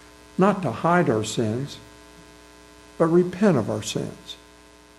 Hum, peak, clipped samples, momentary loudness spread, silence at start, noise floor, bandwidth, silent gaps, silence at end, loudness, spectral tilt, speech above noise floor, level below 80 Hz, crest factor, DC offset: none; -6 dBFS; under 0.1%; 18 LU; 0.4 s; -50 dBFS; 13.5 kHz; none; 0.65 s; -23 LUFS; -6 dB/octave; 28 dB; -56 dBFS; 18 dB; under 0.1%